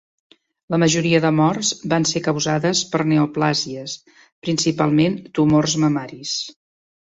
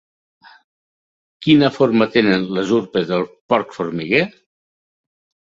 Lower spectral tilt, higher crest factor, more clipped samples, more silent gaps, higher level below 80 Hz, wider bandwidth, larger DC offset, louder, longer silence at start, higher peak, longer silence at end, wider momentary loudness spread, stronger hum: second, -4.5 dB/octave vs -6.5 dB/octave; about the same, 16 dB vs 18 dB; neither; about the same, 4.32-4.42 s vs 3.41-3.49 s; about the same, -56 dBFS vs -58 dBFS; about the same, 8 kHz vs 7.6 kHz; neither; about the same, -19 LUFS vs -17 LUFS; second, 0.7 s vs 1.4 s; about the same, -4 dBFS vs -2 dBFS; second, 0.6 s vs 1.3 s; about the same, 9 LU vs 10 LU; neither